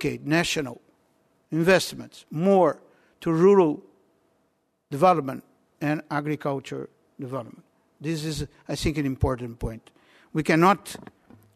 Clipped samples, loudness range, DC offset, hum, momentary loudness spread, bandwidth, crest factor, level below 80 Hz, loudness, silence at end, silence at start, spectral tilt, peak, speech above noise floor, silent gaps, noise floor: under 0.1%; 8 LU; under 0.1%; none; 18 LU; 13.5 kHz; 20 dB; -46 dBFS; -24 LUFS; 0.6 s; 0 s; -6 dB/octave; -6 dBFS; 47 dB; none; -71 dBFS